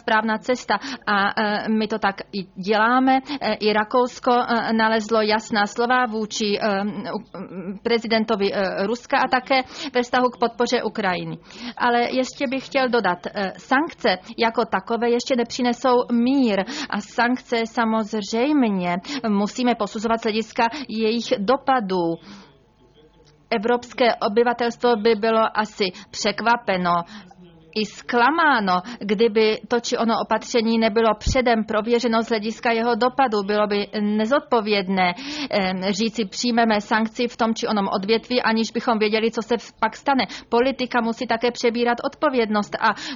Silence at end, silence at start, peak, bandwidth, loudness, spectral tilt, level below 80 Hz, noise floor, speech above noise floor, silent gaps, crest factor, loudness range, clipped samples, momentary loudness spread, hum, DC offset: 0 s; 0.05 s; -6 dBFS; 7.6 kHz; -21 LUFS; -4.5 dB/octave; -48 dBFS; -54 dBFS; 33 dB; none; 16 dB; 3 LU; under 0.1%; 6 LU; none; under 0.1%